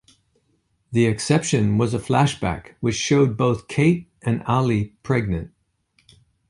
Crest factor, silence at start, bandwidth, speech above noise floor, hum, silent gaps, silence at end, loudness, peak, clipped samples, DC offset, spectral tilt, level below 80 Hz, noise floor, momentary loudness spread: 18 dB; 0.9 s; 11.5 kHz; 47 dB; none; none; 1 s; -21 LUFS; -4 dBFS; under 0.1%; under 0.1%; -6 dB/octave; -46 dBFS; -67 dBFS; 8 LU